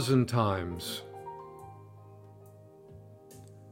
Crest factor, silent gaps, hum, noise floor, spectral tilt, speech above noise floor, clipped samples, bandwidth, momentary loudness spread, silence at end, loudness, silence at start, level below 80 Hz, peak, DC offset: 22 dB; none; none; -53 dBFS; -6 dB/octave; 24 dB; under 0.1%; 16 kHz; 25 LU; 0 s; -32 LUFS; 0 s; -66 dBFS; -12 dBFS; under 0.1%